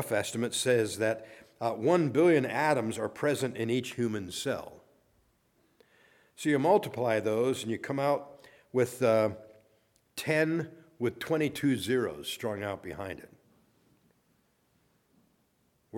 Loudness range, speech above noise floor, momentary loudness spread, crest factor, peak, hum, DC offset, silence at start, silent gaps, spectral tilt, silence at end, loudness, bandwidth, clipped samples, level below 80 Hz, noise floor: 8 LU; 43 dB; 12 LU; 20 dB; -12 dBFS; none; under 0.1%; 0 s; none; -5 dB/octave; 0 s; -30 LUFS; 18 kHz; under 0.1%; -70 dBFS; -72 dBFS